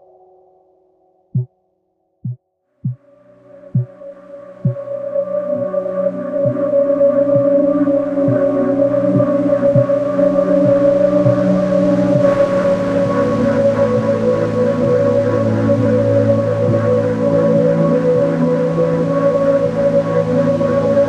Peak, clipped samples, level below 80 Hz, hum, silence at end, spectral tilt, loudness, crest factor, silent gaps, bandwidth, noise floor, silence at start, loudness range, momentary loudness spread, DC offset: 0 dBFS; under 0.1%; -46 dBFS; none; 0 s; -9 dB/octave; -15 LUFS; 14 dB; none; 8.4 kHz; -65 dBFS; 1.35 s; 13 LU; 11 LU; under 0.1%